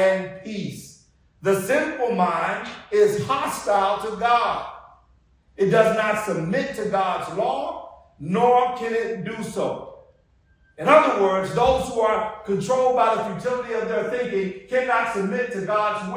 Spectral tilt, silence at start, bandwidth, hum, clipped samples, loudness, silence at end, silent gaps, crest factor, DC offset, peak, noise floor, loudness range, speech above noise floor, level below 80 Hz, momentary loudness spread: -5 dB/octave; 0 s; 16 kHz; none; under 0.1%; -22 LUFS; 0 s; none; 20 dB; under 0.1%; -2 dBFS; -60 dBFS; 3 LU; 38 dB; -52 dBFS; 11 LU